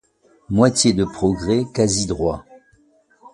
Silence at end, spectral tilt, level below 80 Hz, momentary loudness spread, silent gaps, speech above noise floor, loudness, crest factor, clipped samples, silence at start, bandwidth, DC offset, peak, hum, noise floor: 0.05 s; -5 dB/octave; -42 dBFS; 9 LU; none; 39 dB; -19 LUFS; 20 dB; under 0.1%; 0.5 s; 11.5 kHz; under 0.1%; 0 dBFS; none; -57 dBFS